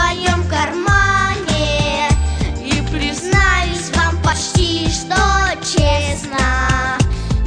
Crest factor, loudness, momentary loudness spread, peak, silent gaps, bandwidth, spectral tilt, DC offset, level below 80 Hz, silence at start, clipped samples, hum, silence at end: 14 dB; -16 LUFS; 5 LU; -2 dBFS; none; 10.5 kHz; -4 dB/octave; under 0.1%; -22 dBFS; 0 s; under 0.1%; none; 0 s